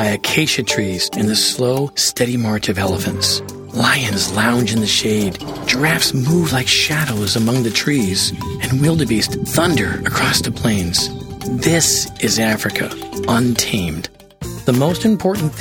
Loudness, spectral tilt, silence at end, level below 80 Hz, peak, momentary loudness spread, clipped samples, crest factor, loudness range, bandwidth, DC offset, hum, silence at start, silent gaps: -16 LUFS; -3.5 dB/octave; 0 s; -40 dBFS; 0 dBFS; 8 LU; under 0.1%; 16 dB; 2 LU; over 20 kHz; under 0.1%; none; 0 s; none